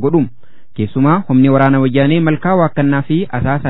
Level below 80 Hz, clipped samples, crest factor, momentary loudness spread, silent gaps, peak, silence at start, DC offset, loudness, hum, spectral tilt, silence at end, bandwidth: -44 dBFS; under 0.1%; 12 dB; 9 LU; none; 0 dBFS; 0 s; 5%; -13 LUFS; none; -11.5 dB/octave; 0 s; 4.1 kHz